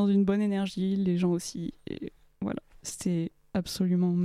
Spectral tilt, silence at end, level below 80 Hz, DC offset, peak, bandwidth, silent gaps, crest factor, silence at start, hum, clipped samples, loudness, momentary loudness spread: -6.5 dB/octave; 0 s; -58 dBFS; under 0.1%; -14 dBFS; 14.5 kHz; none; 16 dB; 0 s; none; under 0.1%; -30 LUFS; 14 LU